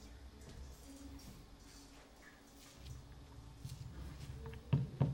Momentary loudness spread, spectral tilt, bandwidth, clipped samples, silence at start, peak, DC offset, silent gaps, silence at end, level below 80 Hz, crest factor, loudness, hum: 20 LU; -7 dB/octave; 16 kHz; under 0.1%; 0 s; -20 dBFS; under 0.1%; none; 0 s; -56 dBFS; 24 dB; -47 LUFS; none